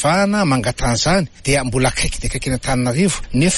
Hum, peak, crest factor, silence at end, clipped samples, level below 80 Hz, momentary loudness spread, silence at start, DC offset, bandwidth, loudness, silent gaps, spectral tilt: none; -4 dBFS; 14 dB; 0 s; under 0.1%; -28 dBFS; 5 LU; 0 s; under 0.1%; 11.5 kHz; -17 LUFS; none; -4.5 dB/octave